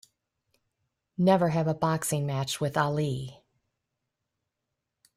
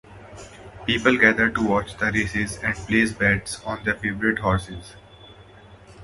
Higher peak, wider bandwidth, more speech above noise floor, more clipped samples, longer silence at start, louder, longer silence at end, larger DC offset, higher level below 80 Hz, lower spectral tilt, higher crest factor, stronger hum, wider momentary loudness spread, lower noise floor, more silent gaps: second, -10 dBFS vs 0 dBFS; first, 16 kHz vs 11.5 kHz; first, 58 dB vs 25 dB; neither; first, 1.2 s vs 0.1 s; second, -27 LUFS vs -22 LUFS; first, 1.85 s vs 0 s; neither; second, -64 dBFS vs -44 dBFS; about the same, -5.5 dB/octave vs -5 dB/octave; about the same, 20 dB vs 24 dB; neither; second, 11 LU vs 22 LU; first, -85 dBFS vs -47 dBFS; neither